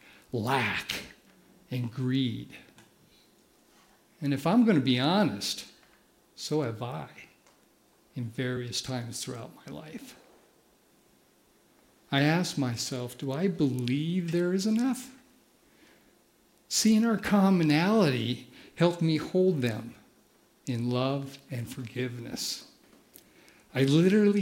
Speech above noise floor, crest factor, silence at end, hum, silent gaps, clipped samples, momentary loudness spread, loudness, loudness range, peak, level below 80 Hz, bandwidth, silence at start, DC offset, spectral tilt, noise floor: 37 dB; 20 dB; 0 s; none; none; under 0.1%; 19 LU; -28 LUFS; 11 LU; -10 dBFS; -68 dBFS; 16.5 kHz; 0.35 s; under 0.1%; -5.5 dB/octave; -64 dBFS